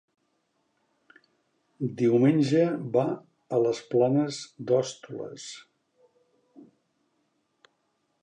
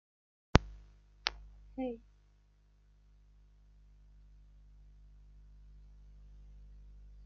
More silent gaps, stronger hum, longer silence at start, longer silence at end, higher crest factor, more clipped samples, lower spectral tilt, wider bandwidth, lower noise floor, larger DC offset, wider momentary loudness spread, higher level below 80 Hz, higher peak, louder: neither; second, none vs 50 Hz at -60 dBFS; first, 1.8 s vs 0.55 s; first, 2.65 s vs 0 s; second, 20 dB vs 38 dB; neither; first, -7 dB/octave vs -4.5 dB/octave; first, 10 kHz vs 7.2 kHz; first, -75 dBFS vs -66 dBFS; neither; second, 17 LU vs 30 LU; second, -78 dBFS vs -48 dBFS; second, -10 dBFS vs -4 dBFS; first, -26 LUFS vs -36 LUFS